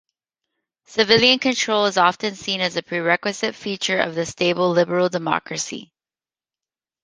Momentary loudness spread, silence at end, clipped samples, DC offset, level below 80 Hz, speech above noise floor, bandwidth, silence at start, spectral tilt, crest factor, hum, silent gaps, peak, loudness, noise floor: 11 LU; 1.2 s; under 0.1%; under 0.1%; -62 dBFS; over 70 dB; 10 kHz; 0.9 s; -3.5 dB/octave; 20 dB; none; none; -2 dBFS; -20 LUFS; under -90 dBFS